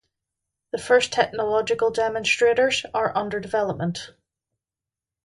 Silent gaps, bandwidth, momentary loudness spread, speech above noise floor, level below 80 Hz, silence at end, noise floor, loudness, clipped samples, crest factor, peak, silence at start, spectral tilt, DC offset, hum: none; 11.5 kHz; 12 LU; 67 dB; -60 dBFS; 1.15 s; -89 dBFS; -22 LUFS; under 0.1%; 18 dB; -6 dBFS; 0.75 s; -3.5 dB/octave; under 0.1%; none